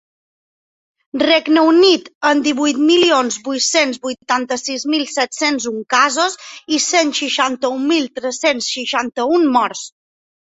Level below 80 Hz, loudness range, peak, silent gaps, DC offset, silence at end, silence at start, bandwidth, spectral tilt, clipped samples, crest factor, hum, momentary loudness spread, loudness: -64 dBFS; 3 LU; -2 dBFS; 2.15-2.21 s; under 0.1%; 0.55 s; 1.15 s; 8.4 kHz; -1 dB/octave; under 0.1%; 16 dB; none; 8 LU; -15 LUFS